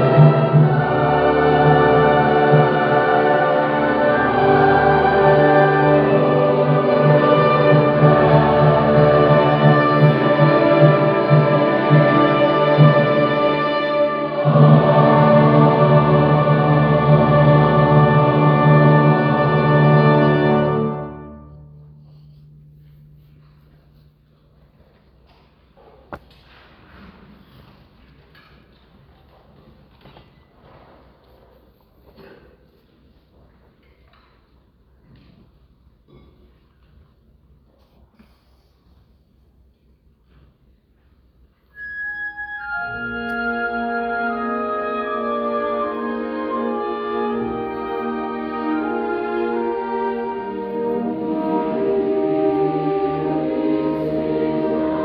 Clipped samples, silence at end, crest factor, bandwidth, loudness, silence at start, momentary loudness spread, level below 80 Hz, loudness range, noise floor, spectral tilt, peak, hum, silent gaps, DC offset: under 0.1%; 0 s; 18 dB; 5 kHz; -16 LUFS; 0 s; 12 LU; -46 dBFS; 10 LU; -56 dBFS; -10.5 dB/octave; 0 dBFS; none; none; under 0.1%